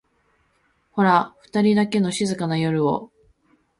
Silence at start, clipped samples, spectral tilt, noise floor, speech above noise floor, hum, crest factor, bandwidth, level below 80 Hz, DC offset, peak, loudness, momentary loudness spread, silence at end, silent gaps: 0.95 s; under 0.1%; -6 dB/octave; -65 dBFS; 45 dB; none; 18 dB; 11.5 kHz; -62 dBFS; under 0.1%; -4 dBFS; -21 LUFS; 8 LU; 0.75 s; none